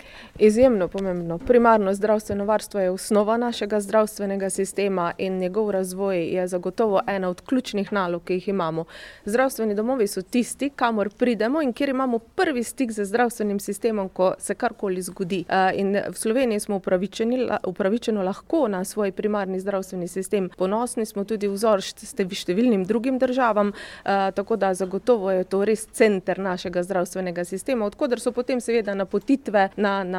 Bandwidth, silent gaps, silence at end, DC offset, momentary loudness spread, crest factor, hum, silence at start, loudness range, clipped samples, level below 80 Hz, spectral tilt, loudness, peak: 16 kHz; none; 0 s; under 0.1%; 7 LU; 20 dB; none; 0.05 s; 3 LU; under 0.1%; -54 dBFS; -5.5 dB/octave; -23 LUFS; -4 dBFS